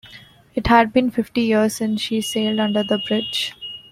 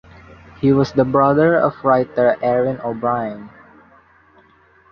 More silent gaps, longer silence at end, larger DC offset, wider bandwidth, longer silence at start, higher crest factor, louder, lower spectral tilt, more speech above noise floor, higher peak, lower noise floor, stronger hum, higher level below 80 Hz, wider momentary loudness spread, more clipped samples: neither; second, 0.1 s vs 1.45 s; neither; first, 16 kHz vs 6.6 kHz; second, 0.05 s vs 0.6 s; about the same, 18 dB vs 16 dB; about the same, -19 LUFS vs -17 LUFS; second, -4.5 dB/octave vs -8.5 dB/octave; second, 26 dB vs 36 dB; about the same, -2 dBFS vs -2 dBFS; second, -45 dBFS vs -52 dBFS; neither; first, -44 dBFS vs -50 dBFS; about the same, 10 LU vs 8 LU; neither